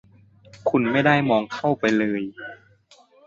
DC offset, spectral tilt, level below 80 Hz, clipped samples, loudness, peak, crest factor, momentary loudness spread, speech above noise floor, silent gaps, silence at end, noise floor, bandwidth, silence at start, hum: under 0.1%; -6.5 dB/octave; -62 dBFS; under 0.1%; -21 LUFS; -6 dBFS; 18 dB; 15 LU; 34 dB; none; 0.7 s; -55 dBFS; 7.6 kHz; 0.55 s; none